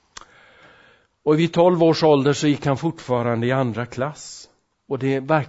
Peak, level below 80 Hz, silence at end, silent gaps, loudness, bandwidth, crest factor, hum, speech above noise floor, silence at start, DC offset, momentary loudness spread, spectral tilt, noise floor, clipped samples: -4 dBFS; -58 dBFS; 0 s; none; -20 LUFS; 8 kHz; 18 dB; none; 35 dB; 1.25 s; under 0.1%; 13 LU; -6.5 dB/octave; -55 dBFS; under 0.1%